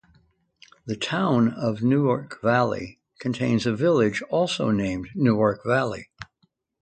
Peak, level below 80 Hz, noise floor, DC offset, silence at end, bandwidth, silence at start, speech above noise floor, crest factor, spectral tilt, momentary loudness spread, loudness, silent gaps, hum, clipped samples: -6 dBFS; -56 dBFS; -69 dBFS; under 0.1%; 0.6 s; 9.2 kHz; 0.85 s; 46 dB; 18 dB; -6.5 dB/octave; 14 LU; -23 LUFS; none; none; under 0.1%